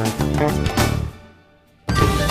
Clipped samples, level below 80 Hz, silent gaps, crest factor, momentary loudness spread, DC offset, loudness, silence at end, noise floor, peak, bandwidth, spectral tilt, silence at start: under 0.1%; -30 dBFS; none; 18 dB; 11 LU; under 0.1%; -20 LUFS; 0 s; -52 dBFS; -2 dBFS; 15.5 kHz; -5.5 dB/octave; 0 s